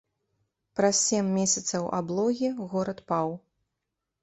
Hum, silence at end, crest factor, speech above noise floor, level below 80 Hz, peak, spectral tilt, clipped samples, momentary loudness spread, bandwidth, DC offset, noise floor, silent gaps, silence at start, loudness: none; 0.85 s; 18 dB; 57 dB; -68 dBFS; -12 dBFS; -4 dB/octave; under 0.1%; 8 LU; 8.4 kHz; under 0.1%; -84 dBFS; none; 0.75 s; -27 LUFS